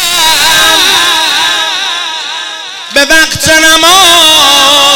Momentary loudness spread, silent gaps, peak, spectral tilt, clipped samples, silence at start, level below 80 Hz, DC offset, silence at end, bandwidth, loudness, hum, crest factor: 13 LU; none; 0 dBFS; 0 dB/octave; 1%; 0 s; -36 dBFS; under 0.1%; 0 s; over 20 kHz; -4 LUFS; none; 6 dB